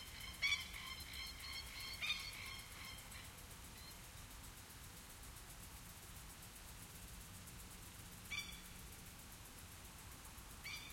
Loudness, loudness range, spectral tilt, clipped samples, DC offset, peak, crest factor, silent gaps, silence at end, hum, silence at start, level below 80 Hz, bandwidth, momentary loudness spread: -49 LUFS; 10 LU; -1.5 dB/octave; under 0.1%; under 0.1%; -26 dBFS; 26 dB; none; 0 s; none; 0 s; -62 dBFS; 16.5 kHz; 13 LU